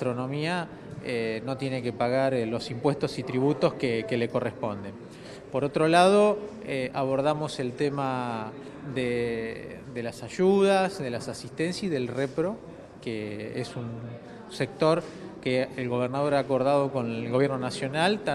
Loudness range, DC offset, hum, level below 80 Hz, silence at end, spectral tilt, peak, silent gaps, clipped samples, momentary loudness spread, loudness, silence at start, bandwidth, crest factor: 6 LU; under 0.1%; none; -60 dBFS; 0 s; -6 dB/octave; -6 dBFS; none; under 0.1%; 15 LU; -27 LUFS; 0 s; 12.5 kHz; 22 dB